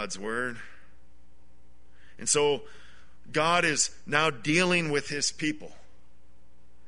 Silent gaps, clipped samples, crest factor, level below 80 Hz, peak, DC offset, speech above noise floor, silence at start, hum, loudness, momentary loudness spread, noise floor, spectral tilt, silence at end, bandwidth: none; under 0.1%; 22 dB; -60 dBFS; -8 dBFS; 1%; 33 dB; 0 s; none; -27 LUFS; 10 LU; -61 dBFS; -2.5 dB/octave; 1.2 s; 11 kHz